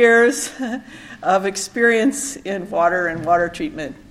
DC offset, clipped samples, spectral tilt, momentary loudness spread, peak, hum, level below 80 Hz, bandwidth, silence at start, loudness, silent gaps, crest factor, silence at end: under 0.1%; under 0.1%; -3.5 dB/octave; 12 LU; -2 dBFS; none; -52 dBFS; 14.5 kHz; 0 s; -19 LUFS; none; 18 dB; 0.15 s